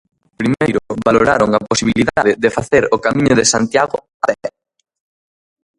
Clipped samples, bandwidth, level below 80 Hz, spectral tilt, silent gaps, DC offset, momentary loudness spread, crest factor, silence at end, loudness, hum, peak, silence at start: under 0.1%; 11.5 kHz; -44 dBFS; -4 dB/octave; 4.14-4.20 s; under 0.1%; 8 LU; 16 dB; 1.3 s; -15 LUFS; none; 0 dBFS; 0.4 s